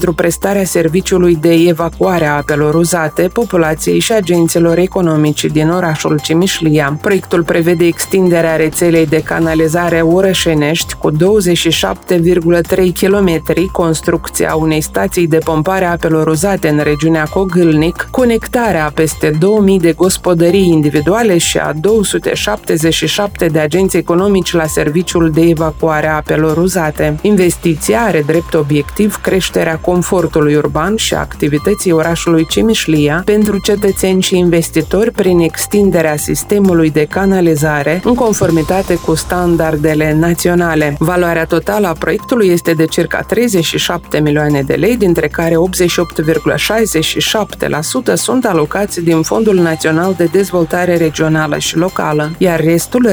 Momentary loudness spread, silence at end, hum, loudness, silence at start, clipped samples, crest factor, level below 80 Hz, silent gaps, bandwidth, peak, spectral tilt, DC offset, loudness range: 4 LU; 0 s; none; -12 LUFS; 0 s; under 0.1%; 12 dB; -32 dBFS; none; over 20 kHz; 0 dBFS; -5 dB/octave; under 0.1%; 2 LU